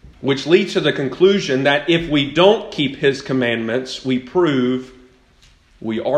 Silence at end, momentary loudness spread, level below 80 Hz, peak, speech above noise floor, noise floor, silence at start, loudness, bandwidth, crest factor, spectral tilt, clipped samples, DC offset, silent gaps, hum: 0 s; 8 LU; -50 dBFS; 0 dBFS; 35 dB; -52 dBFS; 0.05 s; -17 LUFS; 9.6 kHz; 18 dB; -5.5 dB/octave; under 0.1%; under 0.1%; none; none